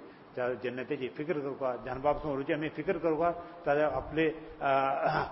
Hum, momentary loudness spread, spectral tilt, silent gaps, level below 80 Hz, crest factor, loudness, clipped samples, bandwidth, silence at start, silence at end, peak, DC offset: none; 7 LU; -10 dB/octave; none; -56 dBFS; 18 dB; -32 LUFS; under 0.1%; 5.8 kHz; 0 s; 0 s; -14 dBFS; under 0.1%